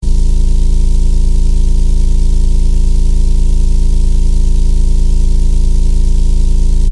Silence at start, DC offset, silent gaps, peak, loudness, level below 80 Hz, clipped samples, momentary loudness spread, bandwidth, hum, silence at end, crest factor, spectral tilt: 0 s; under 0.1%; none; 0 dBFS; -15 LUFS; -8 dBFS; under 0.1%; 0 LU; 10.5 kHz; none; 0 s; 6 dB; -6.5 dB/octave